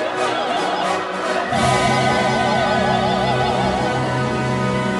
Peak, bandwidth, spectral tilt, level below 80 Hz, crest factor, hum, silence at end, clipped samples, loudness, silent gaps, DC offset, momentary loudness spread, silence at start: -6 dBFS; 11.5 kHz; -5 dB/octave; -42 dBFS; 14 dB; none; 0 s; under 0.1%; -18 LUFS; none; under 0.1%; 4 LU; 0 s